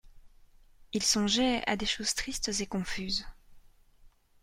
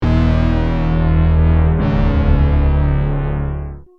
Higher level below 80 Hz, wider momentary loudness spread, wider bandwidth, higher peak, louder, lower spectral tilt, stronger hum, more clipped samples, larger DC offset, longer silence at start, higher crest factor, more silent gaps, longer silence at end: second, -50 dBFS vs -18 dBFS; about the same, 9 LU vs 7 LU; first, 16 kHz vs 5.4 kHz; second, -14 dBFS vs -2 dBFS; second, -30 LUFS vs -16 LUFS; second, -2.5 dB/octave vs -10 dB/octave; neither; neither; neither; about the same, 0.05 s vs 0 s; first, 20 dB vs 12 dB; neither; first, 0.35 s vs 0.15 s